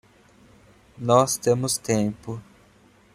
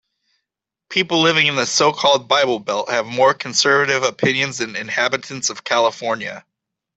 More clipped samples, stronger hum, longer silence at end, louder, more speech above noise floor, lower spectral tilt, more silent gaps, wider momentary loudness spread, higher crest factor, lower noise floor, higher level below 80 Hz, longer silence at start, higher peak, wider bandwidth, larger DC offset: neither; neither; first, 0.75 s vs 0.6 s; second, -22 LUFS vs -17 LUFS; second, 34 dB vs 65 dB; first, -5 dB/octave vs -2.5 dB/octave; neither; first, 17 LU vs 8 LU; about the same, 22 dB vs 18 dB; second, -56 dBFS vs -83 dBFS; first, -58 dBFS vs -64 dBFS; about the same, 1 s vs 0.9 s; about the same, -4 dBFS vs -2 dBFS; first, 16 kHz vs 8.4 kHz; neither